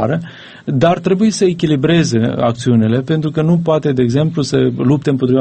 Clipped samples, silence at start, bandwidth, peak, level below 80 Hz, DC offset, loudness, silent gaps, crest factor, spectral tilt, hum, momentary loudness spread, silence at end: under 0.1%; 0 s; 8.8 kHz; 0 dBFS; -46 dBFS; under 0.1%; -14 LUFS; none; 14 dB; -7 dB/octave; none; 4 LU; 0 s